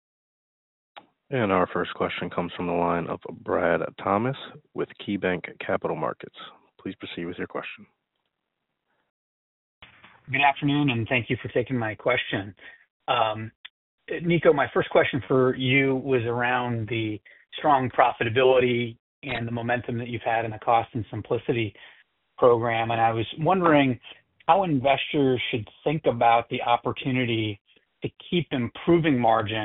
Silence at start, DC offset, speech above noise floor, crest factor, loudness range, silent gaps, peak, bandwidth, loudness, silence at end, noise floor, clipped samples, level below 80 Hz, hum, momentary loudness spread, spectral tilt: 0.95 s; under 0.1%; 57 dB; 22 dB; 8 LU; 9.10-9.81 s, 12.90-13.00 s, 13.55-13.64 s, 13.70-13.98 s, 18.99-19.22 s, 27.61-27.65 s; -4 dBFS; 4 kHz; -25 LUFS; 0 s; -81 dBFS; under 0.1%; -58 dBFS; none; 14 LU; -4.5 dB/octave